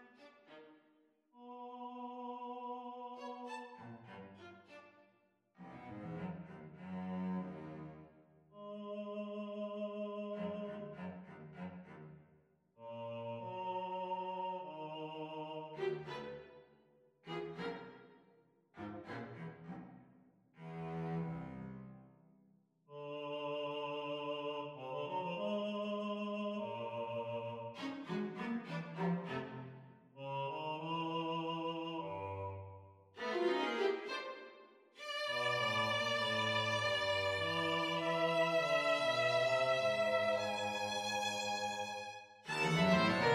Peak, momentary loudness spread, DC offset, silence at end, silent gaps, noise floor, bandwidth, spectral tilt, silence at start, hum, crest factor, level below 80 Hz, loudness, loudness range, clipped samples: -20 dBFS; 20 LU; under 0.1%; 0 s; none; -75 dBFS; 15 kHz; -4.5 dB/octave; 0 s; none; 22 dB; -76 dBFS; -39 LUFS; 15 LU; under 0.1%